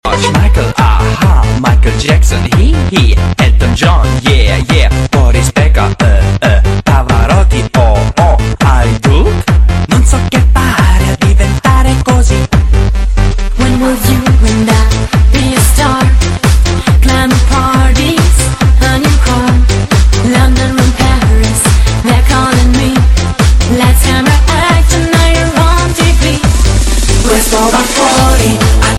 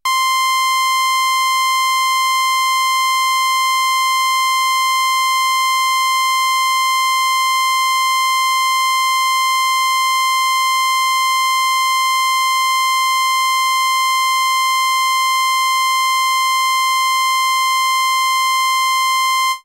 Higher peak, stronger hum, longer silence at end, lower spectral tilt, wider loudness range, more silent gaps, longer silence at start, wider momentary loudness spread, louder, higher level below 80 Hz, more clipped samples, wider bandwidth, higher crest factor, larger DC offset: first, 0 dBFS vs -10 dBFS; neither; about the same, 0 s vs 0.05 s; first, -5 dB/octave vs 6.5 dB/octave; about the same, 1 LU vs 0 LU; neither; about the same, 0.05 s vs 0.05 s; about the same, 2 LU vs 0 LU; first, -9 LUFS vs -14 LUFS; first, -10 dBFS vs -76 dBFS; first, 0.6% vs under 0.1%; second, 13.5 kHz vs 16 kHz; about the same, 6 dB vs 6 dB; neither